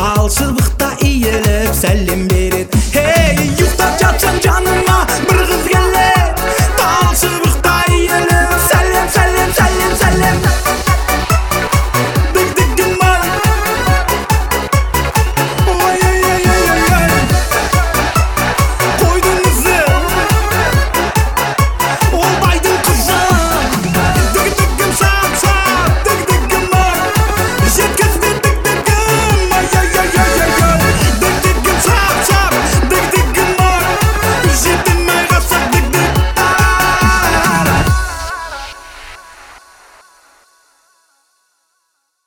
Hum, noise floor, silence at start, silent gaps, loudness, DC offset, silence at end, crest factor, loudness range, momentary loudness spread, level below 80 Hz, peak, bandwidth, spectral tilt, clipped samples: none; -65 dBFS; 0 s; none; -12 LUFS; under 0.1%; 2.7 s; 12 dB; 2 LU; 3 LU; -18 dBFS; 0 dBFS; 19.5 kHz; -4 dB/octave; under 0.1%